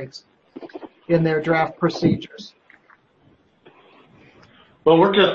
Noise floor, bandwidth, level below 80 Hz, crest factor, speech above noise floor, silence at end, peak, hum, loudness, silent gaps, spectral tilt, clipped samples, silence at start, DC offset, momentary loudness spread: -58 dBFS; 7.2 kHz; -56 dBFS; 20 dB; 39 dB; 0 s; -2 dBFS; none; -19 LUFS; none; -7 dB/octave; under 0.1%; 0 s; under 0.1%; 25 LU